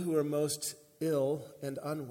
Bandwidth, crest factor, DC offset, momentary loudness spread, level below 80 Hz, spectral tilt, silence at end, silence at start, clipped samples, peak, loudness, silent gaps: 17 kHz; 16 dB; under 0.1%; 8 LU; -78 dBFS; -5 dB/octave; 0 s; 0 s; under 0.1%; -18 dBFS; -34 LUFS; none